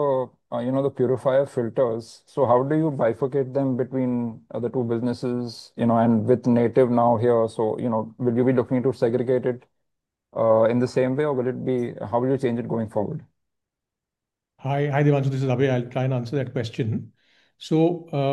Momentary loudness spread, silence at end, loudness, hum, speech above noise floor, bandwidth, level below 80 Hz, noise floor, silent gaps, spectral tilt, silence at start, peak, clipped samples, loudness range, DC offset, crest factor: 9 LU; 0 s; -23 LUFS; none; 64 dB; 10 kHz; -68 dBFS; -86 dBFS; none; -8.5 dB/octave; 0 s; -6 dBFS; under 0.1%; 5 LU; under 0.1%; 16 dB